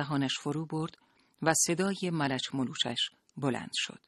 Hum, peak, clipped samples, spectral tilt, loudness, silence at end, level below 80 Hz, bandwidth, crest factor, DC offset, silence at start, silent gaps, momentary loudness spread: none; -10 dBFS; under 0.1%; -3.5 dB/octave; -31 LUFS; 0.1 s; -70 dBFS; 12.5 kHz; 22 dB; under 0.1%; 0 s; none; 9 LU